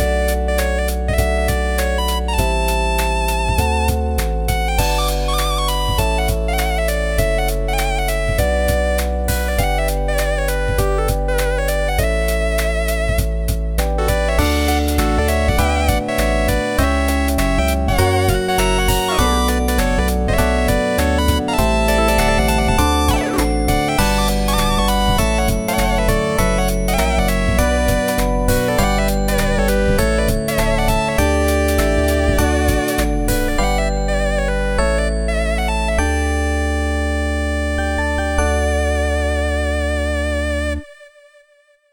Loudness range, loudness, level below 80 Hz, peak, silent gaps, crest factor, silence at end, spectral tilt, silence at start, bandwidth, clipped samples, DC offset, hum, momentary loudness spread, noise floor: 3 LU; -18 LUFS; -20 dBFS; -4 dBFS; none; 14 dB; 0.85 s; -5 dB/octave; 0 s; 19.5 kHz; under 0.1%; under 0.1%; none; 3 LU; -55 dBFS